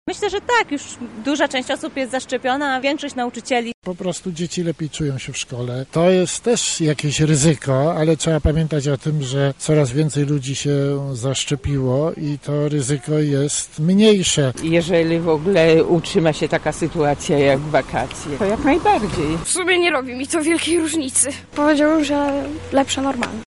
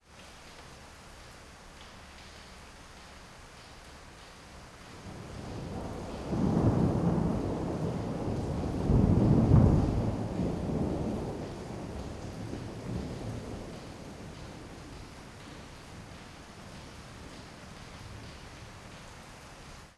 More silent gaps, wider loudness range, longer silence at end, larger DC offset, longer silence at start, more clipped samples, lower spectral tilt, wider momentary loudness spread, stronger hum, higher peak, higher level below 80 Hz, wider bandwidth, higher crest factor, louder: first, 3.74-3.82 s vs none; second, 5 LU vs 21 LU; about the same, 0.05 s vs 0.05 s; first, 0.1% vs under 0.1%; about the same, 0.05 s vs 0.1 s; neither; second, -5 dB/octave vs -7.5 dB/octave; second, 9 LU vs 23 LU; neither; first, 0 dBFS vs -10 dBFS; about the same, -40 dBFS vs -42 dBFS; about the same, 11.5 kHz vs 12 kHz; second, 18 dB vs 24 dB; first, -19 LUFS vs -31 LUFS